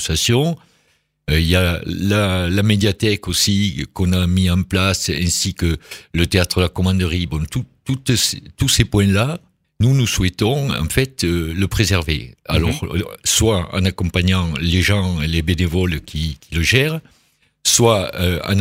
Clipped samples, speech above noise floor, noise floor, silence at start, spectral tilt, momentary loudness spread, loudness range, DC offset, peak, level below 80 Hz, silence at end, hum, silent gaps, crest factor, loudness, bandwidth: under 0.1%; 45 dB; -62 dBFS; 0 s; -4.5 dB/octave; 8 LU; 2 LU; under 0.1%; 0 dBFS; -32 dBFS; 0 s; none; none; 18 dB; -18 LUFS; 16.5 kHz